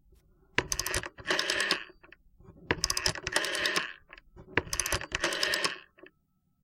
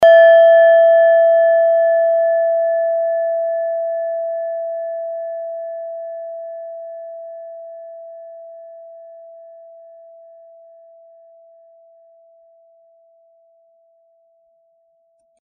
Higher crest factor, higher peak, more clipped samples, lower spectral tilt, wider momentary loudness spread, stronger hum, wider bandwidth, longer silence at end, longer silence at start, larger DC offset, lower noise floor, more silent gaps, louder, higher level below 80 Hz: first, 28 dB vs 16 dB; second, -6 dBFS vs -2 dBFS; neither; first, -1.5 dB/octave vs 1.5 dB/octave; second, 6 LU vs 26 LU; neither; first, 16.5 kHz vs 3.4 kHz; second, 0.55 s vs 6.35 s; first, 0.55 s vs 0 s; neither; first, -73 dBFS vs -61 dBFS; neither; second, -30 LUFS vs -14 LUFS; first, -50 dBFS vs -72 dBFS